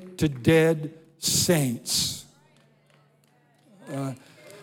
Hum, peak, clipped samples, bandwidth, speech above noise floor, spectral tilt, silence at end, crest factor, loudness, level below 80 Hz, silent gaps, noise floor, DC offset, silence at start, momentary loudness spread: none; -6 dBFS; under 0.1%; 17.5 kHz; 39 dB; -4 dB/octave; 0 s; 22 dB; -24 LUFS; -58 dBFS; none; -62 dBFS; under 0.1%; 0 s; 17 LU